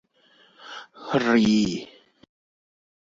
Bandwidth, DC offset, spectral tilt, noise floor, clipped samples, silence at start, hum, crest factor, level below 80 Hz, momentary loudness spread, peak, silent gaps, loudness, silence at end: 7.8 kHz; under 0.1%; -5.5 dB/octave; -59 dBFS; under 0.1%; 0.65 s; none; 18 dB; -58 dBFS; 21 LU; -8 dBFS; none; -22 LUFS; 1.2 s